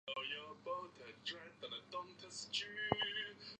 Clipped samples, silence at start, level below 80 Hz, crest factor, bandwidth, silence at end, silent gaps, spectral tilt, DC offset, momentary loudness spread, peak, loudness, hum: under 0.1%; 0.05 s; -74 dBFS; 30 dB; 9.6 kHz; 0.05 s; none; -2.5 dB/octave; under 0.1%; 11 LU; -16 dBFS; -44 LUFS; none